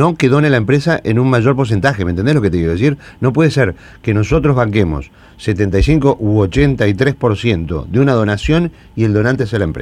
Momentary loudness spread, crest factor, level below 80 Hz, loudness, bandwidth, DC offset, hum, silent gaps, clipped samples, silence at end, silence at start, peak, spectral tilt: 6 LU; 14 dB; -30 dBFS; -14 LUFS; 11 kHz; under 0.1%; none; none; under 0.1%; 0 s; 0 s; 0 dBFS; -7.5 dB/octave